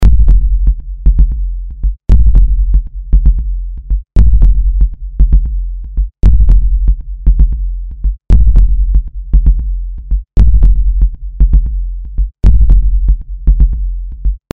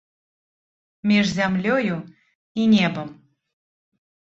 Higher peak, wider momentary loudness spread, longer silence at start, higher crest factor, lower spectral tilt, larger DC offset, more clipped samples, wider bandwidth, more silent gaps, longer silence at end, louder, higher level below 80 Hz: first, 0 dBFS vs -6 dBFS; second, 11 LU vs 15 LU; second, 0 s vs 1.05 s; second, 8 dB vs 18 dB; first, -9.5 dB/octave vs -6 dB/octave; neither; neither; second, 1.4 kHz vs 7.8 kHz; second, none vs 2.35-2.55 s; second, 0 s vs 1.2 s; first, -14 LUFS vs -21 LUFS; first, -10 dBFS vs -60 dBFS